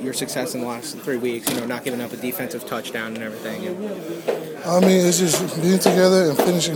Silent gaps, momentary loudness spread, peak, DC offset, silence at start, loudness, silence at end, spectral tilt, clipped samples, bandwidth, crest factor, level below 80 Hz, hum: none; 13 LU; 0 dBFS; under 0.1%; 0 s; -21 LUFS; 0 s; -4.5 dB/octave; under 0.1%; 19.5 kHz; 20 dB; -62 dBFS; none